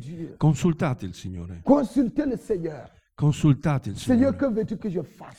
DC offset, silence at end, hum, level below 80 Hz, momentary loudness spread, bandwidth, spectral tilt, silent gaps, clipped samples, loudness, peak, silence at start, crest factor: under 0.1%; 0.05 s; none; -48 dBFS; 14 LU; 12 kHz; -8 dB/octave; none; under 0.1%; -24 LUFS; -6 dBFS; 0 s; 18 dB